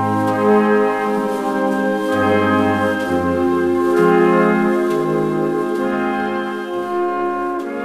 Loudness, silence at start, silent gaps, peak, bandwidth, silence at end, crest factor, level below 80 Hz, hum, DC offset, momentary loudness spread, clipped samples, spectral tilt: -17 LUFS; 0 s; none; -4 dBFS; 15 kHz; 0 s; 14 dB; -52 dBFS; none; 0.1%; 7 LU; under 0.1%; -7 dB/octave